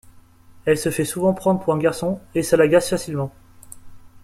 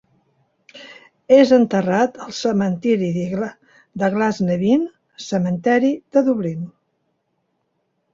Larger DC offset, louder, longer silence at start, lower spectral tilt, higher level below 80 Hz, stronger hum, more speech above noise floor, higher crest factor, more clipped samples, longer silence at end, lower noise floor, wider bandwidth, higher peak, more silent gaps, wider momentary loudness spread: neither; about the same, -20 LUFS vs -18 LUFS; second, 0.55 s vs 0.75 s; about the same, -5.5 dB/octave vs -6.5 dB/octave; first, -52 dBFS vs -60 dBFS; neither; second, 28 dB vs 53 dB; about the same, 18 dB vs 18 dB; neither; second, 0.05 s vs 1.45 s; second, -47 dBFS vs -70 dBFS; first, 16 kHz vs 7.8 kHz; about the same, -4 dBFS vs -2 dBFS; neither; second, 11 LU vs 16 LU